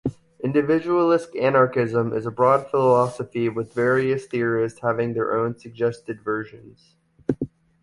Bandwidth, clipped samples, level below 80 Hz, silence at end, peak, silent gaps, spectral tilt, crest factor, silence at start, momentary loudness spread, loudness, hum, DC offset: 11.5 kHz; under 0.1%; -58 dBFS; 0.35 s; -4 dBFS; none; -7.5 dB/octave; 18 dB; 0.05 s; 11 LU; -22 LUFS; none; under 0.1%